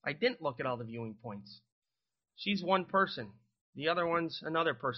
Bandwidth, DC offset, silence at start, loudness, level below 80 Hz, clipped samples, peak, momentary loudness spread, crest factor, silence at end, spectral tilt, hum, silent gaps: 6.2 kHz; under 0.1%; 0.05 s; -34 LUFS; -74 dBFS; under 0.1%; -14 dBFS; 16 LU; 22 dB; 0 s; -3 dB/octave; none; 1.72-1.82 s, 3.61-3.73 s